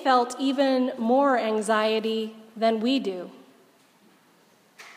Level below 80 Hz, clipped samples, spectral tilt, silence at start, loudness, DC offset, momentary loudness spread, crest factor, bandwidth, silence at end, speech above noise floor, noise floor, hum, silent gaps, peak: -88 dBFS; under 0.1%; -4 dB/octave; 0 s; -24 LUFS; under 0.1%; 11 LU; 18 dB; 15.5 kHz; 0.05 s; 36 dB; -60 dBFS; none; none; -8 dBFS